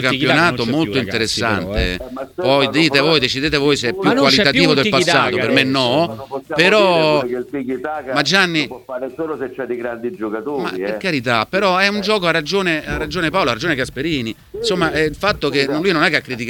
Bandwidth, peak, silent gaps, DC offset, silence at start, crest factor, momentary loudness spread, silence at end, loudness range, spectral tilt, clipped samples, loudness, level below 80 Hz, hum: 19 kHz; 0 dBFS; none; under 0.1%; 0 s; 16 dB; 12 LU; 0 s; 6 LU; -4.5 dB/octave; under 0.1%; -16 LUFS; -40 dBFS; none